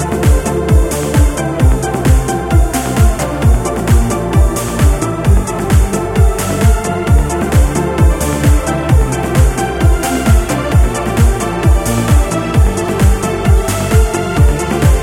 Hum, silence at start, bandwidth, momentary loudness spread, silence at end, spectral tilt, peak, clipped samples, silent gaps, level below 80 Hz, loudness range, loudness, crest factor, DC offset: none; 0 s; 16.5 kHz; 2 LU; 0 s; -6 dB/octave; 0 dBFS; under 0.1%; none; -14 dBFS; 1 LU; -13 LUFS; 10 dB; under 0.1%